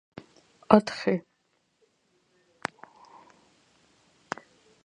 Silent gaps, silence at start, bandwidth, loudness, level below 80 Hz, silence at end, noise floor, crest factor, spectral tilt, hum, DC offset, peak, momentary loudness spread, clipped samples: none; 0.7 s; 10 kHz; -27 LUFS; -66 dBFS; 3.65 s; -73 dBFS; 32 dB; -6.5 dB/octave; none; under 0.1%; 0 dBFS; 28 LU; under 0.1%